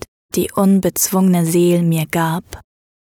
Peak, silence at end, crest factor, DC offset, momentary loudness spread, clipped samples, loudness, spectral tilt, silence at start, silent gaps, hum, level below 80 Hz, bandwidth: -2 dBFS; 0.6 s; 14 dB; under 0.1%; 7 LU; under 0.1%; -16 LUFS; -5.5 dB/octave; 0.35 s; none; none; -48 dBFS; 18.5 kHz